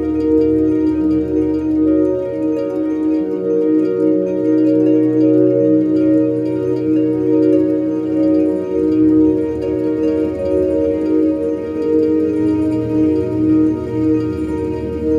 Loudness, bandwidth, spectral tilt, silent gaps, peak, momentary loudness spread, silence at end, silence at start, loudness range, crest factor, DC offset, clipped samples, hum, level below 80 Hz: -15 LUFS; 5 kHz; -10 dB/octave; none; -2 dBFS; 6 LU; 0 s; 0 s; 2 LU; 12 dB; under 0.1%; under 0.1%; none; -44 dBFS